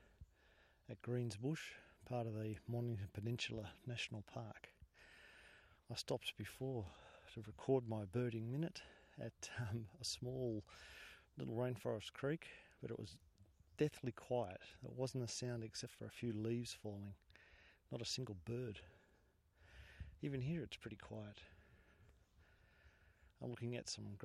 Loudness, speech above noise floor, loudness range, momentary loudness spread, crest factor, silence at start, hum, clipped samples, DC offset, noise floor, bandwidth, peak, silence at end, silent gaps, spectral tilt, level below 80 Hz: -47 LUFS; 29 dB; 6 LU; 19 LU; 22 dB; 0 s; none; under 0.1%; under 0.1%; -75 dBFS; 14.5 kHz; -24 dBFS; 0 s; none; -5.5 dB/octave; -70 dBFS